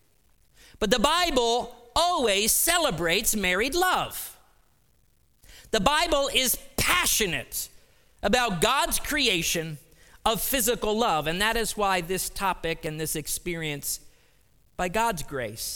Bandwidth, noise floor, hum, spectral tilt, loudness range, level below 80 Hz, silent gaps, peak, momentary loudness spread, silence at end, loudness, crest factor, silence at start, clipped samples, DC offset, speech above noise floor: 19 kHz; -65 dBFS; none; -2 dB/octave; 5 LU; -44 dBFS; none; -4 dBFS; 10 LU; 0 s; -25 LUFS; 24 dB; 0.8 s; under 0.1%; under 0.1%; 40 dB